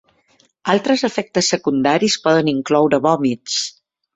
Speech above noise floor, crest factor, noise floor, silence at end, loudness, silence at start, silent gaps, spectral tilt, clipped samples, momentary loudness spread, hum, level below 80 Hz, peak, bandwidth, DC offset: 42 dB; 16 dB; -58 dBFS; 0.45 s; -17 LUFS; 0.65 s; none; -4 dB/octave; under 0.1%; 6 LU; none; -58 dBFS; -2 dBFS; 8.4 kHz; under 0.1%